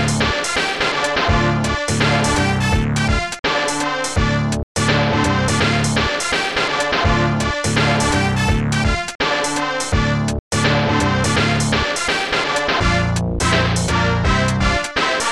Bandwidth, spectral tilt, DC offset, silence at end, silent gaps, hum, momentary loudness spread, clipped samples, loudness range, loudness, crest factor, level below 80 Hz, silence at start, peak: 13.5 kHz; -4.5 dB/octave; 0.5%; 0 s; 3.39-3.43 s, 4.63-4.75 s, 9.15-9.19 s, 10.39-10.51 s; none; 3 LU; under 0.1%; 1 LU; -17 LUFS; 14 dB; -28 dBFS; 0 s; -4 dBFS